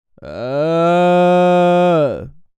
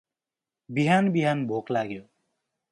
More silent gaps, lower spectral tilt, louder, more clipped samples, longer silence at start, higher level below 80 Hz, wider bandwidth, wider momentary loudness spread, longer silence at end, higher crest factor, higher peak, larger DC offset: neither; about the same, -7.5 dB/octave vs -7 dB/octave; first, -13 LUFS vs -25 LUFS; neither; second, 0.2 s vs 0.7 s; first, -50 dBFS vs -70 dBFS; second, 8.8 kHz vs 11.5 kHz; first, 15 LU vs 12 LU; second, 0.3 s vs 0.7 s; second, 10 dB vs 18 dB; first, -4 dBFS vs -8 dBFS; neither